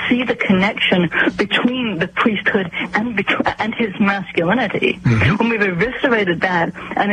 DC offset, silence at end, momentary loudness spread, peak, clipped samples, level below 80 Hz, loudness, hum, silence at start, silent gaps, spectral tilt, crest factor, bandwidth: under 0.1%; 0 s; 5 LU; -4 dBFS; under 0.1%; -46 dBFS; -17 LUFS; none; 0 s; none; -6.5 dB/octave; 14 dB; 9.6 kHz